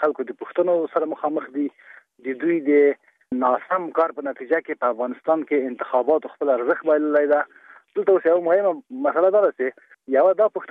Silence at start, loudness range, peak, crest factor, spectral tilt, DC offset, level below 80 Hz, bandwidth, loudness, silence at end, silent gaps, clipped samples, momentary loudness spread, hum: 0 s; 3 LU; -6 dBFS; 14 dB; -8.5 dB/octave; under 0.1%; -78 dBFS; 4 kHz; -21 LUFS; 0.05 s; none; under 0.1%; 10 LU; none